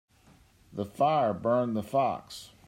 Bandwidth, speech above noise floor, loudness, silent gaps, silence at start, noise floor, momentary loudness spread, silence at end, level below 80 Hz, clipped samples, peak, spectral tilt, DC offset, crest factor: 16 kHz; 32 dB; -29 LUFS; none; 0.7 s; -60 dBFS; 14 LU; 0.2 s; -66 dBFS; under 0.1%; -14 dBFS; -6.5 dB/octave; under 0.1%; 16 dB